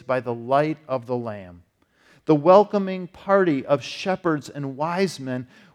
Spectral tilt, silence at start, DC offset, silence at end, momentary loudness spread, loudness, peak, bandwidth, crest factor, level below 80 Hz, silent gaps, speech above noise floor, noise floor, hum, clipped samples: -6.5 dB/octave; 0.1 s; under 0.1%; 0.3 s; 16 LU; -22 LUFS; -2 dBFS; 12.5 kHz; 22 dB; -66 dBFS; none; 37 dB; -59 dBFS; none; under 0.1%